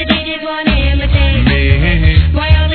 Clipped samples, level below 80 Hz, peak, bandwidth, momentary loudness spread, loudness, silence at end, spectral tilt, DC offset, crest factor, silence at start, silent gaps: 0.3%; -14 dBFS; 0 dBFS; 4.5 kHz; 4 LU; -12 LUFS; 0 s; -9.5 dB/octave; under 0.1%; 10 dB; 0 s; none